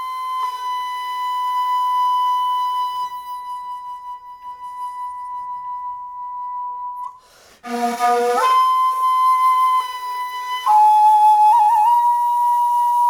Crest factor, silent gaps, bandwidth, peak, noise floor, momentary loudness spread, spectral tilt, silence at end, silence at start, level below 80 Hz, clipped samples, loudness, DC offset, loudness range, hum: 12 dB; none; 18.5 kHz; -6 dBFS; -48 dBFS; 18 LU; -1 dB/octave; 0 s; 0 s; -66 dBFS; under 0.1%; -17 LUFS; under 0.1%; 15 LU; none